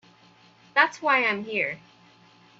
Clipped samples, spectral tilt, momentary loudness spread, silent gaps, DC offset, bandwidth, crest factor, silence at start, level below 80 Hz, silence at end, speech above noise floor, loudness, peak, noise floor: under 0.1%; -3.5 dB/octave; 8 LU; none; under 0.1%; 8 kHz; 22 dB; 0.75 s; -78 dBFS; 0.85 s; 32 dB; -23 LUFS; -6 dBFS; -56 dBFS